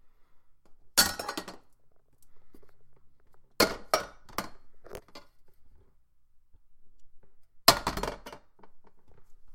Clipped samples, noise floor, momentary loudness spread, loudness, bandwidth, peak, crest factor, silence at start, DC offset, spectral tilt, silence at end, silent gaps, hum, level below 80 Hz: under 0.1%; -59 dBFS; 25 LU; -28 LUFS; 16.5 kHz; 0 dBFS; 34 dB; 0.05 s; under 0.1%; -1.5 dB/octave; 0 s; none; none; -54 dBFS